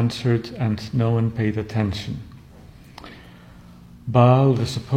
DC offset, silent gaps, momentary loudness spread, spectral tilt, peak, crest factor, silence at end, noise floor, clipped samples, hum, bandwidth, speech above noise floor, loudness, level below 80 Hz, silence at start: under 0.1%; none; 24 LU; -7.5 dB/octave; -2 dBFS; 20 dB; 0 s; -45 dBFS; under 0.1%; none; 9.8 kHz; 25 dB; -21 LUFS; -48 dBFS; 0 s